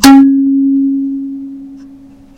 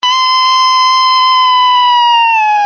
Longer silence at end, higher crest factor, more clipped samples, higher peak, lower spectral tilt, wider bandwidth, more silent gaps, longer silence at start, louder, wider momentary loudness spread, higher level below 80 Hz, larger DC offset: first, 0.5 s vs 0 s; about the same, 10 dB vs 6 dB; first, 2% vs under 0.1%; about the same, 0 dBFS vs -2 dBFS; first, -3 dB/octave vs 4 dB/octave; first, 17.5 kHz vs 6.8 kHz; neither; about the same, 0 s vs 0 s; about the same, -10 LUFS vs -8 LUFS; first, 23 LU vs 1 LU; first, -40 dBFS vs -60 dBFS; neither